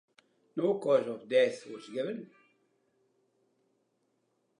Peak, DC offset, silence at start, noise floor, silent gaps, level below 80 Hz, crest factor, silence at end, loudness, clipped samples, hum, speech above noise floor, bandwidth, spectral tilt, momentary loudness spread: -14 dBFS; under 0.1%; 0.55 s; -77 dBFS; none; under -90 dBFS; 20 dB; 2.35 s; -31 LUFS; under 0.1%; none; 46 dB; 10.5 kHz; -5.5 dB/octave; 14 LU